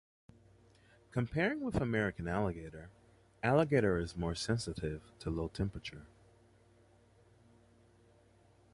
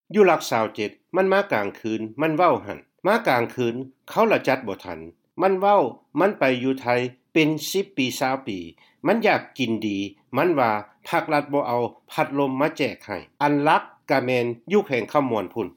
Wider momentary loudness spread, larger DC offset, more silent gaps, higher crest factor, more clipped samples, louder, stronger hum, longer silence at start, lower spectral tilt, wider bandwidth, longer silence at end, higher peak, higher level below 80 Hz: first, 16 LU vs 10 LU; neither; neither; about the same, 22 dB vs 18 dB; neither; second, -36 LUFS vs -23 LUFS; neither; first, 1.15 s vs 0.1 s; about the same, -6.5 dB/octave vs -5.5 dB/octave; second, 11.5 kHz vs 17 kHz; first, 2.7 s vs 0.05 s; second, -16 dBFS vs -6 dBFS; first, -54 dBFS vs -70 dBFS